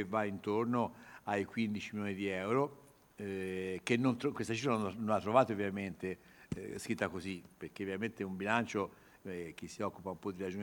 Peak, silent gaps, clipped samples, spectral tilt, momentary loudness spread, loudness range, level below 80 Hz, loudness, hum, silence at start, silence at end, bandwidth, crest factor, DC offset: -14 dBFS; none; under 0.1%; -6 dB/octave; 12 LU; 5 LU; -70 dBFS; -37 LUFS; none; 0 s; 0 s; over 20 kHz; 22 dB; under 0.1%